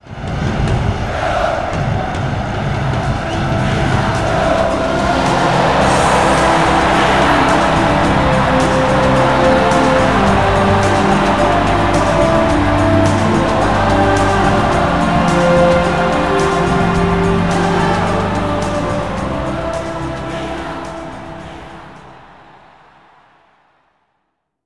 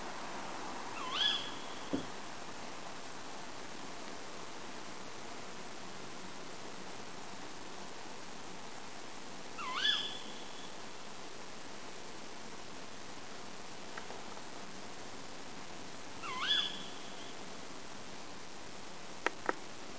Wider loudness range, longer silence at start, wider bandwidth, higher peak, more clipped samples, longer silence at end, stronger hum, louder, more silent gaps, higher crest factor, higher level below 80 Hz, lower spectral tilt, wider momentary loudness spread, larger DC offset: about the same, 10 LU vs 8 LU; about the same, 0.05 s vs 0 s; first, 12 kHz vs 8 kHz; first, -2 dBFS vs -14 dBFS; neither; first, 2.05 s vs 0 s; neither; first, -14 LUFS vs -42 LUFS; neither; second, 12 dB vs 30 dB; first, -28 dBFS vs -70 dBFS; first, -6 dB/octave vs -2 dB/octave; second, 9 LU vs 15 LU; about the same, 1% vs 0.6%